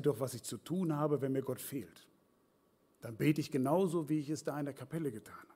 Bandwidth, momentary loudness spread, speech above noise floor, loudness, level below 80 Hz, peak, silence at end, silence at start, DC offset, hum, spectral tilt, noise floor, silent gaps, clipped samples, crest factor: 16 kHz; 12 LU; 36 dB; -36 LUFS; -78 dBFS; -18 dBFS; 0.1 s; 0 s; under 0.1%; none; -6.5 dB/octave; -72 dBFS; none; under 0.1%; 18 dB